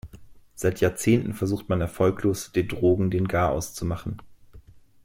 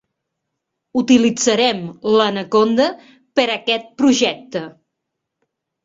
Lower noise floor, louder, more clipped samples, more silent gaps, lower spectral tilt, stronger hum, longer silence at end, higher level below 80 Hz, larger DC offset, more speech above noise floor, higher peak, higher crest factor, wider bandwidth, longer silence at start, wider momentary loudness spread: second, -49 dBFS vs -78 dBFS; second, -25 LUFS vs -17 LUFS; neither; neither; first, -6.5 dB/octave vs -3.5 dB/octave; neither; second, 0.25 s vs 1.15 s; first, -46 dBFS vs -60 dBFS; neither; second, 25 dB vs 62 dB; second, -8 dBFS vs -2 dBFS; about the same, 18 dB vs 16 dB; first, 16.5 kHz vs 8 kHz; second, 0.05 s vs 0.95 s; about the same, 8 LU vs 10 LU